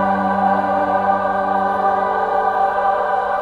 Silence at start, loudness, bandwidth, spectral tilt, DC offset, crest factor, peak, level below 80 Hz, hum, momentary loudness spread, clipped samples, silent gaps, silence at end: 0 s; -17 LUFS; 6.8 kHz; -7 dB/octave; under 0.1%; 12 dB; -4 dBFS; -50 dBFS; none; 1 LU; under 0.1%; none; 0 s